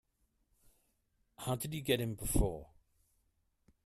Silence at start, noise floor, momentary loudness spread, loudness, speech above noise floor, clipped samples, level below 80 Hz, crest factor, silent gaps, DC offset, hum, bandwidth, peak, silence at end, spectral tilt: 1.4 s; -78 dBFS; 9 LU; -36 LUFS; 43 dB; under 0.1%; -46 dBFS; 24 dB; none; under 0.1%; none; 15.5 kHz; -16 dBFS; 1.2 s; -4.5 dB/octave